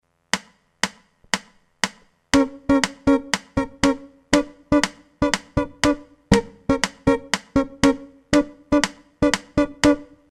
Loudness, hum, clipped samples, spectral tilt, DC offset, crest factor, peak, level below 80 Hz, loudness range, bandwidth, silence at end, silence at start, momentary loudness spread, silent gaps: -22 LUFS; none; under 0.1%; -4 dB/octave; under 0.1%; 22 dB; 0 dBFS; -40 dBFS; 2 LU; 14.5 kHz; 0.25 s; 0.35 s; 7 LU; none